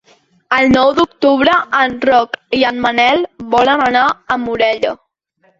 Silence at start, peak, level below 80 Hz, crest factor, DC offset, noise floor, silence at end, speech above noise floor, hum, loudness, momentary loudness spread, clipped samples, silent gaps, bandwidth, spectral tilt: 0.5 s; 0 dBFS; -46 dBFS; 14 dB; under 0.1%; -58 dBFS; 0.65 s; 45 dB; none; -13 LUFS; 8 LU; under 0.1%; none; 7.8 kHz; -4.5 dB/octave